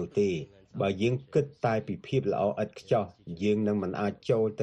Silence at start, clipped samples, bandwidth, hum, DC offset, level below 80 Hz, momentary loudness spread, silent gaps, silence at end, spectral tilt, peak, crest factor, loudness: 0 s; under 0.1%; 9.8 kHz; none; under 0.1%; -62 dBFS; 5 LU; none; 0 s; -7.5 dB/octave; -12 dBFS; 16 dB; -30 LUFS